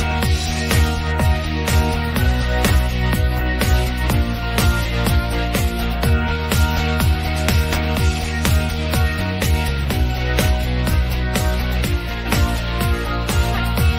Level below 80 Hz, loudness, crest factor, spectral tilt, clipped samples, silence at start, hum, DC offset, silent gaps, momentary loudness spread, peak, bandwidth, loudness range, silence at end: -22 dBFS; -19 LUFS; 14 dB; -5 dB/octave; under 0.1%; 0 s; none; under 0.1%; none; 3 LU; -4 dBFS; 16 kHz; 1 LU; 0 s